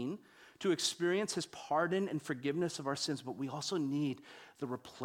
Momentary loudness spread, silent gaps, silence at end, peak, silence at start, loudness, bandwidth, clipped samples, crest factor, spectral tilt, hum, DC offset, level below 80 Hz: 10 LU; none; 0 s; -20 dBFS; 0 s; -36 LUFS; 16.5 kHz; under 0.1%; 18 dB; -4 dB/octave; none; under 0.1%; -80 dBFS